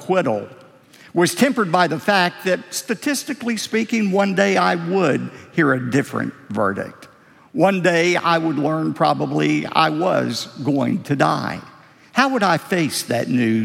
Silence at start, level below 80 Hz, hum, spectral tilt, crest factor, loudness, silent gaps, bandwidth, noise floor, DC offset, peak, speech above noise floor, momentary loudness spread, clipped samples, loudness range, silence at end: 0 s; -66 dBFS; none; -5 dB/octave; 18 dB; -19 LUFS; none; 16.5 kHz; -47 dBFS; under 0.1%; -2 dBFS; 28 dB; 8 LU; under 0.1%; 2 LU; 0 s